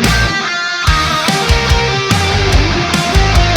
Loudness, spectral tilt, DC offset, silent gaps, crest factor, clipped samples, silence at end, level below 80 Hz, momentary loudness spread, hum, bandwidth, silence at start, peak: -12 LUFS; -4 dB/octave; under 0.1%; none; 12 dB; under 0.1%; 0 s; -18 dBFS; 2 LU; none; 19 kHz; 0 s; 0 dBFS